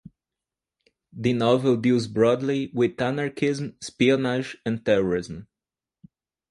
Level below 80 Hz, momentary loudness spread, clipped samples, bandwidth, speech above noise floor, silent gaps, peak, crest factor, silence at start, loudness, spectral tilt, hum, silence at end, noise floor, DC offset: -58 dBFS; 9 LU; under 0.1%; 11.5 kHz; over 67 dB; none; -6 dBFS; 18 dB; 1.15 s; -24 LUFS; -6.5 dB/octave; none; 1.05 s; under -90 dBFS; under 0.1%